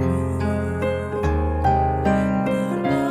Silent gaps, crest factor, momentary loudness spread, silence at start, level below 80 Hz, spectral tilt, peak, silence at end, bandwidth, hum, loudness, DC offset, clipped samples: none; 14 dB; 4 LU; 0 s; -30 dBFS; -8 dB/octave; -8 dBFS; 0 s; 13 kHz; none; -22 LUFS; under 0.1%; under 0.1%